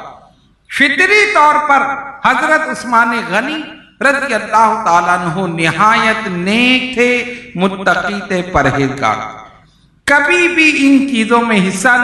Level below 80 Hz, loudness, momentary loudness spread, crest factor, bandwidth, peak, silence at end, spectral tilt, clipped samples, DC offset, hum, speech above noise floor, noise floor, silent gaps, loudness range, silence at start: -44 dBFS; -12 LUFS; 9 LU; 12 dB; 12.5 kHz; 0 dBFS; 0 s; -4.5 dB/octave; under 0.1%; under 0.1%; none; 36 dB; -48 dBFS; none; 3 LU; 0 s